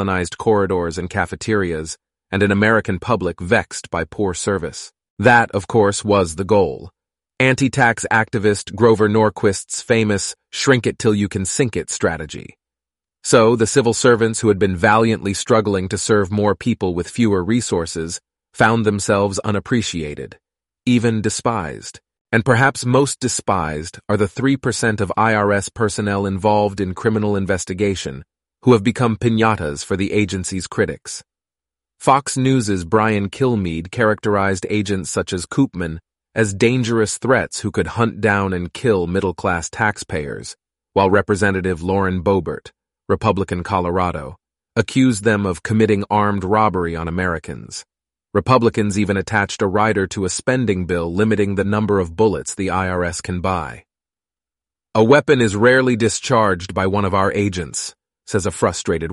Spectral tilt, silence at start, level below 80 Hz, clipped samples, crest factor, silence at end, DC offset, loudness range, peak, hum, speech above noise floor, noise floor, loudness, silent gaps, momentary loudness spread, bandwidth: -5 dB/octave; 0 s; -44 dBFS; under 0.1%; 18 dB; 0 s; under 0.1%; 4 LU; 0 dBFS; none; over 73 dB; under -90 dBFS; -18 LUFS; 5.10-5.17 s, 22.21-22.25 s; 10 LU; 11.5 kHz